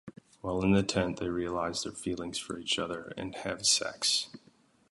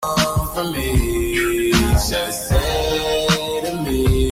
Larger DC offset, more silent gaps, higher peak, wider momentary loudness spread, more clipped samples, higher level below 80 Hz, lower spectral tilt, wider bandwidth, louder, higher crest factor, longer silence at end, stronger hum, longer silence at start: neither; neither; second, -12 dBFS vs -4 dBFS; first, 11 LU vs 5 LU; neither; second, -54 dBFS vs -24 dBFS; second, -3 dB/octave vs -4.5 dB/octave; second, 11.5 kHz vs 16.5 kHz; second, -31 LUFS vs -19 LUFS; about the same, 20 dB vs 16 dB; first, 0.55 s vs 0 s; neither; about the same, 0.05 s vs 0 s